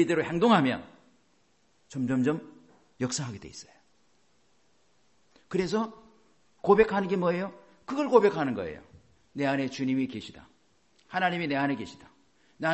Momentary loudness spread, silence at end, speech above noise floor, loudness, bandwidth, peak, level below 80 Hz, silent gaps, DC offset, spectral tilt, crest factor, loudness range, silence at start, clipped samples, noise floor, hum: 19 LU; 0 s; 42 dB; -28 LUFS; 8.6 kHz; -6 dBFS; -62 dBFS; none; under 0.1%; -5.5 dB/octave; 24 dB; 10 LU; 0 s; under 0.1%; -69 dBFS; none